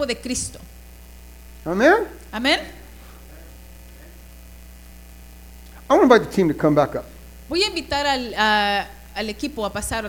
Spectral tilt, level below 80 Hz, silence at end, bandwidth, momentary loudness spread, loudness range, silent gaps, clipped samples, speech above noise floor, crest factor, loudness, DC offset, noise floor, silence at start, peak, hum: -4 dB/octave; -42 dBFS; 0 s; 18 kHz; 16 LU; 8 LU; none; under 0.1%; 22 dB; 22 dB; -20 LUFS; under 0.1%; -42 dBFS; 0 s; 0 dBFS; none